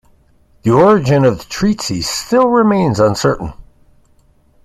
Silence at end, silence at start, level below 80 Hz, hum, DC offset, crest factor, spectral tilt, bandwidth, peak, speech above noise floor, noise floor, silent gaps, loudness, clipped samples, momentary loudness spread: 1 s; 0.65 s; -40 dBFS; none; under 0.1%; 14 dB; -6 dB/octave; 14.5 kHz; 0 dBFS; 39 dB; -52 dBFS; none; -13 LUFS; under 0.1%; 9 LU